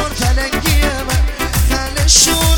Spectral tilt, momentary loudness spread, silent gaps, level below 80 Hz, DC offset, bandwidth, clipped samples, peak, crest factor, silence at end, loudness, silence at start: -3 dB/octave; 9 LU; none; -16 dBFS; under 0.1%; 19.5 kHz; under 0.1%; 0 dBFS; 14 dB; 0 s; -13 LUFS; 0 s